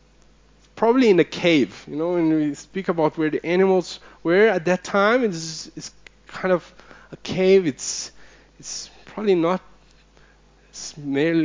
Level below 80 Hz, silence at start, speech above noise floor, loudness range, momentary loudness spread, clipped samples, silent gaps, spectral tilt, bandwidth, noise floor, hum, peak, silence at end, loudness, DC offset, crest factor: -56 dBFS; 0.75 s; 33 dB; 5 LU; 18 LU; under 0.1%; none; -5 dB/octave; 7.6 kHz; -54 dBFS; none; -4 dBFS; 0 s; -21 LUFS; under 0.1%; 18 dB